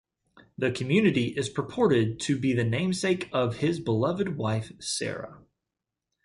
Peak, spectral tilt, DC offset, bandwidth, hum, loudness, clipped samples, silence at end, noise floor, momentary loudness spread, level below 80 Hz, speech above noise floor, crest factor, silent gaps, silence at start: -10 dBFS; -5.5 dB/octave; under 0.1%; 11.5 kHz; none; -27 LUFS; under 0.1%; 0.85 s; -87 dBFS; 8 LU; -60 dBFS; 60 dB; 18 dB; none; 0.6 s